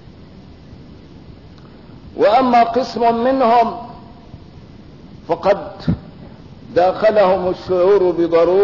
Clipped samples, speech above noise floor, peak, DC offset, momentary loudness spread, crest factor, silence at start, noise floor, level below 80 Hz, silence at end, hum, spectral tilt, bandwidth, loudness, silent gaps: under 0.1%; 26 dB; -4 dBFS; 0.3%; 11 LU; 12 dB; 0.35 s; -40 dBFS; -46 dBFS; 0 s; none; -7.5 dB/octave; 6 kHz; -15 LUFS; none